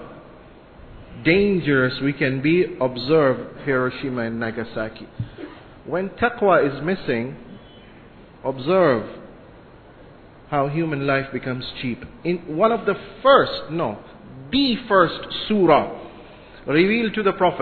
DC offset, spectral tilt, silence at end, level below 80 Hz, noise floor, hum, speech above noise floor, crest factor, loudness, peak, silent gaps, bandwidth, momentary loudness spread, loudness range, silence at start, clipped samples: under 0.1%; -9.5 dB/octave; 0 s; -50 dBFS; -45 dBFS; none; 25 dB; 20 dB; -21 LUFS; -2 dBFS; none; 4.6 kHz; 17 LU; 6 LU; 0 s; under 0.1%